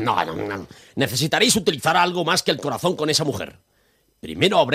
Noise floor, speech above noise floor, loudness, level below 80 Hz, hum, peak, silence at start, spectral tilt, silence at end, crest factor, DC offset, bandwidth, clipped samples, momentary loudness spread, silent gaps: -63 dBFS; 42 dB; -20 LUFS; -56 dBFS; none; -4 dBFS; 0 s; -3.5 dB/octave; 0 s; 18 dB; under 0.1%; 15.5 kHz; under 0.1%; 16 LU; none